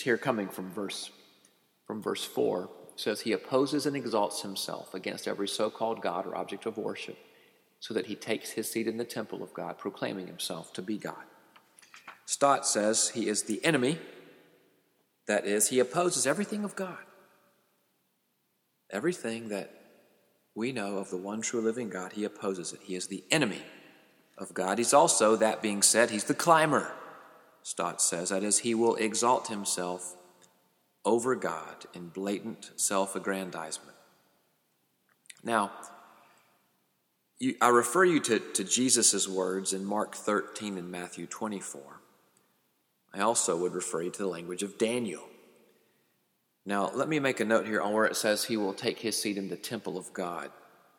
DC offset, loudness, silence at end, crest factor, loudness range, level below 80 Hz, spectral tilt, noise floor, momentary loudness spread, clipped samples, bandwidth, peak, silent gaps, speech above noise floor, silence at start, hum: under 0.1%; -30 LUFS; 0.45 s; 24 dB; 10 LU; -82 dBFS; -3 dB/octave; -76 dBFS; 16 LU; under 0.1%; 17.5 kHz; -6 dBFS; none; 46 dB; 0 s; none